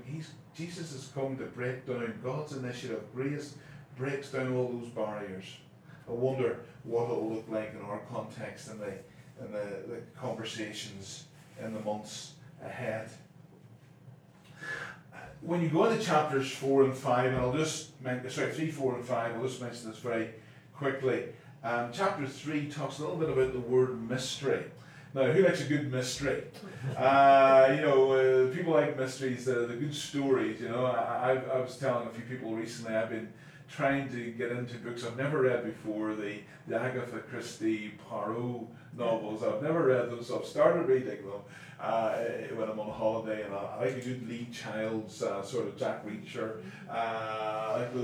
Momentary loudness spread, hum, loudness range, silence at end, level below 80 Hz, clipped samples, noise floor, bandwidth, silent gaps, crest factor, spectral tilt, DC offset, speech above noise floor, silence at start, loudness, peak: 16 LU; none; 14 LU; 0 s; -66 dBFS; under 0.1%; -55 dBFS; 15 kHz; none; 22 dB; -5.5 dB/octave; under 0.1%; 24 dB; 0 s; -32 LUFS; -10 dBFS